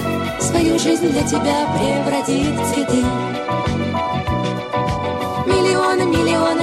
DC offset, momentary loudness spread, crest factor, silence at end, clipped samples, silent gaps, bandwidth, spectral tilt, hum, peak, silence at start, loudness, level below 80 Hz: under 0.1%; 6 LU; 14 dB; 0 s; under 0.1%; none; 15 kHz; -5 dB/octave; none; -4 dBFS; 0 s; -18 LUFS; -38 dBFS